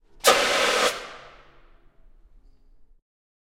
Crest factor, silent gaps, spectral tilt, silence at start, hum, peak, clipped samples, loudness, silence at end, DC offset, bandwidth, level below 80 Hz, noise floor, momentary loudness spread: 26 dB; none; 0 dB/octave; 0.25 s; none; 0 dBFS; under 0.1%; -20 LUFS; 2.3 s; under 0.1%; 16.5 kHz; -54 dBFS; -53 dBFS; 22 LU